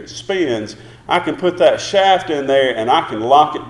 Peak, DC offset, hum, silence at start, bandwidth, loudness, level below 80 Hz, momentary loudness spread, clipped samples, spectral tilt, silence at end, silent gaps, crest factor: 0 dBFS; under 0.1%; none; 0 s; 11 kHz; -15 LUFS; -52 dBFS; 9 LU; under 0.1%; -4 dB/octave; 0 s; none; 16 dB